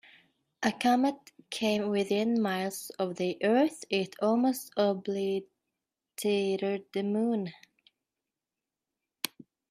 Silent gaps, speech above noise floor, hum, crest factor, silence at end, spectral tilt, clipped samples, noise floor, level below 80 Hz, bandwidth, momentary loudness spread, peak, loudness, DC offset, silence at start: none; 61 dB; none; 20 dB; 0.45 s; -5 dB/octave; under 0.1%; -90 dBFS; -76 dBFS; 16 kHz; 11 LU; -10 dBFS; -30 LUFS; under 0.1%; 0.6 s